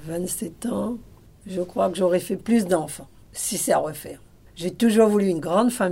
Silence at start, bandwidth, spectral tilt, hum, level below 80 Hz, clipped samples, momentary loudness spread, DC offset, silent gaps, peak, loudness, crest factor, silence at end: 0 s; 16 kHz; -5 dB/octave; none; -54 dBFS; under 0.1%; 16 LU; under 0.1%; none; -6 dBFS; -23 LUFS; 18 dB; 0 s